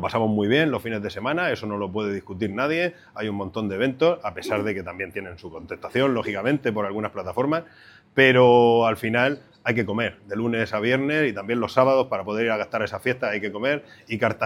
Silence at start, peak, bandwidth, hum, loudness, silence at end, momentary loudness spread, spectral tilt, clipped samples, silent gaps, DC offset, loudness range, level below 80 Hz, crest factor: 0 s; -2 dBFS; 15.5 kHz; none; -23 LUFS; 0 s; 11 LU; -6.5 dB/octave; under 0.1%; none; under 0.1%; 6 LU; -60 dBFS; 22 dB